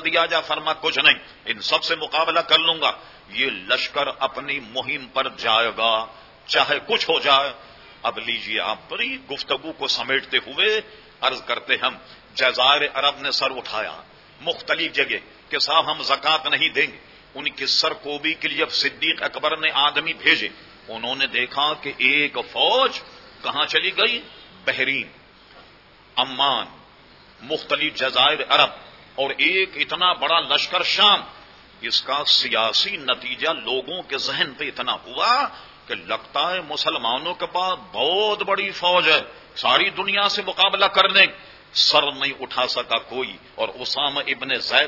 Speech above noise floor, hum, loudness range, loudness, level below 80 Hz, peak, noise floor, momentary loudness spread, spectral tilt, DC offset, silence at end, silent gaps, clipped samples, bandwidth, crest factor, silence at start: 28 dB; none; 5 LU; -20 LUFS; -60 dBFS; 0 dBFS; -50 dBFS; 11 LU; -2 dB/octave; under 0.1%; 0 s; none; under 0.1%; 6 kHz; 22 dB; 0 s